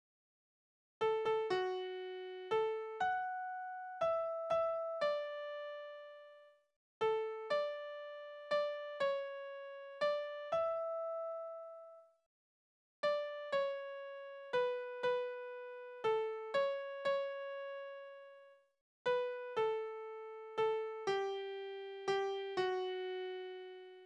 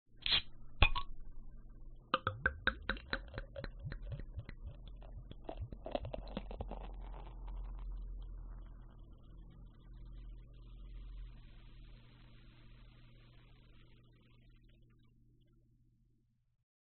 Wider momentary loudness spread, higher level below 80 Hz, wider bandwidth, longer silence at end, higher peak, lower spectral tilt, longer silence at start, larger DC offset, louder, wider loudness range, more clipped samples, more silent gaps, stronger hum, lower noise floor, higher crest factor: second, 12 LU vs 27 LU; second, -82 dBFS vs -48 dBFS; first, 10 kHz vs 4.3 kHz; second, 0 s vs 1.3 s; second, -24 dBFS vs -10 dBFS; first, -4 dB/octave vs -2 dB/octave; first, 1 s vs 0.1 s; neither; about the same, -40 LUFS vs -41 LUFS; second, 3 LU vs 24 LU; neither; first, 6.76-7.01 s, 12.26-13.03 s, 18.81-19.05 s vs none; neither; second, -62 dBFS vs -75 dBFS; second, 16 dB vs 34 dB